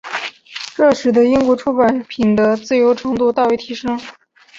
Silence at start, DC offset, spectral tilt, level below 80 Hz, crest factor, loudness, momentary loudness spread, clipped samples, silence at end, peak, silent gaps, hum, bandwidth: 0.05 s; under 0.1%; -5.5 dB/octave; -52 dBFS; 14 dB; -15 LUFS; 13 LU; under 0.1%; 0 s; -2 dBFS; none; none; 7.8 kHz